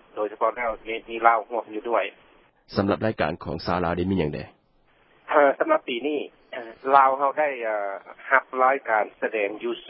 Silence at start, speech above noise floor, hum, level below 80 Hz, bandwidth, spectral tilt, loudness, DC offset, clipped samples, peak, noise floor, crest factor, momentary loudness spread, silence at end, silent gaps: 0.15 s; 38 dB; none; -52 dBFS; 5.8 kHz; -10 dB/octave; -24 LUFS; under 0.1%; under 0.1%; -2 dBFS; -62 dBFS; 24 dB; 13 LU; 0 s; none